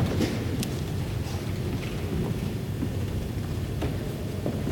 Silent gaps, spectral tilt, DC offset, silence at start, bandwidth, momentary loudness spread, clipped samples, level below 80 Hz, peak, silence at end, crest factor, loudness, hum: none; -6.5 dB/octave; under 0.1%; 0 s; 17.5 kHz; 3 LU; under 0.1%; -40 dBFS; -10 dBFS; 0 s; 18 dB; -30 LUFS; none